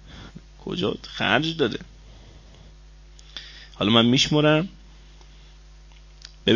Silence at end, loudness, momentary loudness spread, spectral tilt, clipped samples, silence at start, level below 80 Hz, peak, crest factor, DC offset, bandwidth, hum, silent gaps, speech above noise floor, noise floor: 0 s; -22 LUFS; 23 LU; -5 dB/octave; under 0.1%; 0.05 s; -48 dBFS; -4 dBFS; 22 dB; under 0.1%; 7.4 kHz; none; none; 26 dB; -47 dBFS